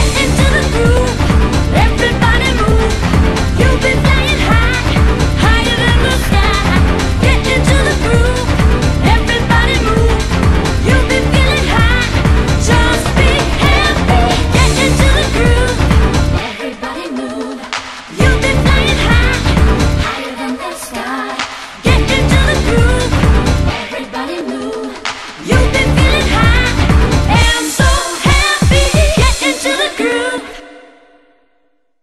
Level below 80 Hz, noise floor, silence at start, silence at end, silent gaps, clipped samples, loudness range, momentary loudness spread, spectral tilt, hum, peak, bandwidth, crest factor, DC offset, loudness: -16 dBFS; -61 dBFS; 0 s; 1.2 s; none; under 0.1%; 3 LU; 10 LU; -5 dB/octave; none; 0 dBFS; 13.5 kHz; 12 dB; under 0.1%; -12 LUFS